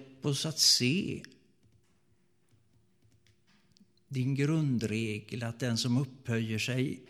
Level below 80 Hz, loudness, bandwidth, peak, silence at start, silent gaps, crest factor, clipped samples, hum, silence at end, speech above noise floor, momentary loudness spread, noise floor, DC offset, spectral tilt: -70 dBFS; -30 LUFS; 16 kHz; -10 dBFS; 0 s; none; 22 dB; under 0.1%; none; 0.05 s; 41 dB; 14 LU; -72 dBFS; under 0.1%; -4 dB/octave